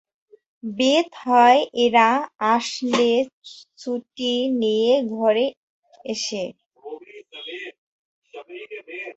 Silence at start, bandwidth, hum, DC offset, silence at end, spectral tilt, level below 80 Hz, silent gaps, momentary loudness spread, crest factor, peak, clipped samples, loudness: 0.65 s; 8.2 kHz; none; under 0.1%; 0.05 s; -3.5 dB/octave; -70 dBFS; 3.33-3.42 s, 5.57-5.83 s, 6.66-6.70 s, 7.78-8.22 s; 22 LU; 18 dB; -4 dBFS; under 0.1%; -20 LUFS